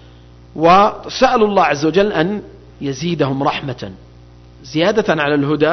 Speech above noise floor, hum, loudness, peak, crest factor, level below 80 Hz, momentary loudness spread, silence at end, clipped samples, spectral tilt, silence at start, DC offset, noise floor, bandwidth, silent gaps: 27 dB; none; -15 LUFS; -2 dBFS; 14 dB; -44 dBFS; 15 LU; 0 s; under 0.1%; -5.5 dB/octave; 0.55 s; under 0.1%; -41 dBFS; 6.4 kHz; none